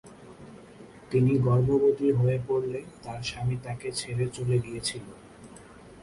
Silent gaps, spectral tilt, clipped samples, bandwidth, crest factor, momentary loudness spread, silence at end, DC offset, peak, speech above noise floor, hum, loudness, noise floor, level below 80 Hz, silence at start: none; -6.5 dB/octave; under 0.1%; 11.5 kHz; 16 dB; 25 LU; 0 s; under 0.1%; -12 dBFS; 22 dB; none; -27 LUFS; -49 dBFS; -54 dBFS; 0.05 s